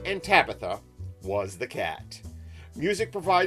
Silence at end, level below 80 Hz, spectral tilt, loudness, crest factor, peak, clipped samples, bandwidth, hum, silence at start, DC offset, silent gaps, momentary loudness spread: 0 s; -52 dBFS; -4.5 dB/octave; -27 LUFS; 24 dB; -4 dBFS; under 0.1%; 13.5 kHz; none; 0 s; under 0.1%; none; 22 LU